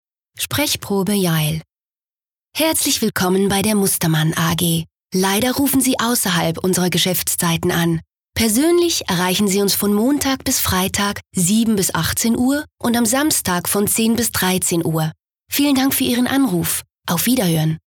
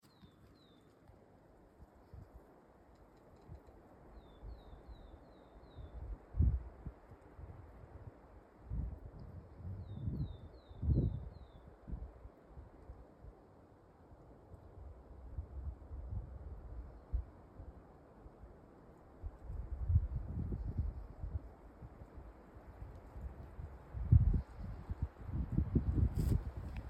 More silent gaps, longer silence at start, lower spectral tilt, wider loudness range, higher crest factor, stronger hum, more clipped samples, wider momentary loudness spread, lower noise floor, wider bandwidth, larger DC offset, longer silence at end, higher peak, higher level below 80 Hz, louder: neither; first, 0.35 s vs 0.05 s; second, -4 dB/octave vs -9.5 dB/octave; second, 1 LU vs 20 LU; second, 12 dB vs 26 dB; neither; neither; second, 5 LU vs 25 LU; first, under -90 dBFS vs -64 dBFS; first, over 20 kHz vs 8.8 kHz; neither; about the same, 0.1 s vs 0 s; first, -4 dBFS vs -16 dBFS; about the same, -46 dBFS vs -46 dBFS; first, -17 LUFS vs -41 LUFS